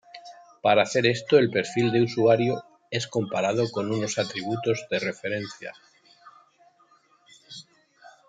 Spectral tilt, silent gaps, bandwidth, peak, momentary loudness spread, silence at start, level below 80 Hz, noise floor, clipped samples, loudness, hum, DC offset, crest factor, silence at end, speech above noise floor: -5 dB/octave; none; 9.4 kHz; -6 dBFS; 21 LU; 0.15 s; -70 dBFS; -61 dBFS; under 0.1%; -24 LUFS; none; under 0.1%; 20 dB; 0.2 s; 37 dB